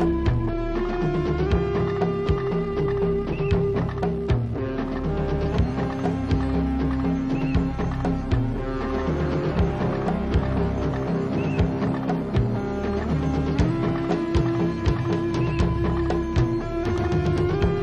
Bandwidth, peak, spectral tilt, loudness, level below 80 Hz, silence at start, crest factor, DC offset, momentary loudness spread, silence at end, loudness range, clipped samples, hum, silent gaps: 8.4 kHz; -8 dBFS; -8.5 dB/octave; -24 LUFS; -30 dBFS; 0 s; 16 dB; under 0.1%; 3 LU; 0 s; 1 LU; under 0.1%; none; none